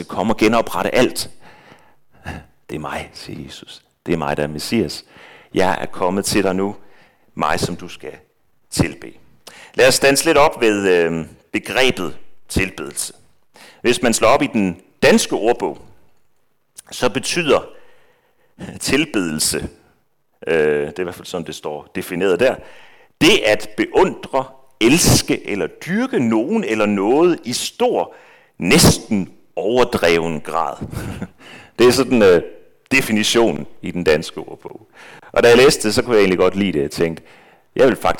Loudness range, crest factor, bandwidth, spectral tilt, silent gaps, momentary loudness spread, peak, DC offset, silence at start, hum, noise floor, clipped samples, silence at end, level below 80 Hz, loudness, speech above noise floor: 7 LU; 14 dB; 19 kHz; -4 dB/octave; none; 19 LU; -4 dBFS; under 0.1%; 0 s; none; -64 dBFS; under 0.1%; 0 s; -42 dBFS; -17 LUFS; 47 dB